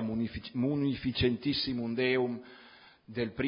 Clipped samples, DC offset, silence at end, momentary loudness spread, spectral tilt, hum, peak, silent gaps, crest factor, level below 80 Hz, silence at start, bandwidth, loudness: under 0.1%; under 0.1%; 0 s; 9 LU; -10 dB/octave; none; -16 dBFS; none; 16 dB; -52 dBFS; 0 s; 5.4 kHz; -32 LUFS